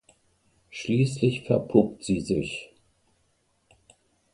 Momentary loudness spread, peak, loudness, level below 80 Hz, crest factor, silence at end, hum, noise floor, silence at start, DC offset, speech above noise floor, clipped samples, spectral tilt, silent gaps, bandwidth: 14 LU; -6 dBFS; -26 LUFS; -56 dBFS; 22 dB; 1.7 s; none; -69 dBFS; 0.75 s; under 0.1%; 45 dB; under 0.1%; -6.5 dB/octave; none; 11.5 kHz